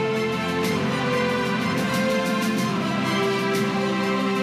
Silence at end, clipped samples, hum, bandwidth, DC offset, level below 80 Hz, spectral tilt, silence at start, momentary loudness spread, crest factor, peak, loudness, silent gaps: 0 s; under 0.1%; none; 15.5 kHz; under 0.1%; -58 dBFS; -5 dB/octave; 0 s; 2 LU; 10 dB; -12 dBFS; -23 LUFS; none